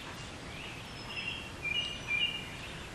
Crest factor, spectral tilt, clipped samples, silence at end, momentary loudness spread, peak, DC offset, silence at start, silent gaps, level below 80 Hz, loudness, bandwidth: 18 dB; -2.5 dB/octave; under 0.1%; 0 s; 12 LU; -20 dBFS; under 0.1%; 0 s; none; -54 dBFS; -36 LUFS; 14 kHz